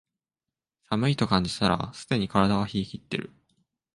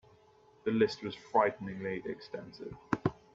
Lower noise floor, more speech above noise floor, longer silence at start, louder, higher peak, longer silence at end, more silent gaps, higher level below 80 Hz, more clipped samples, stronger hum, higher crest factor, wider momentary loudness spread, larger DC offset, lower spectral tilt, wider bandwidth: first, -90 dBFS vs -63 dBFS; first, 64 dB vs 29 dB; first, 0.9 s vs 0.65 s; first, -27 LUFS vs -34 LUFS; first, -6 dBFS vs -12 dBFS; first, 0.7 s vs 0.2 s; neither; first, -52 dBFS vs -64 dBFS; neither; neither; about the same, 22 dB vs 22 dB; second, 10 LU vs 15 LU; neither; about the same, -6 dB/octave vs -7 dB/octave; first, 11.5 kHz vs 7.8 kHz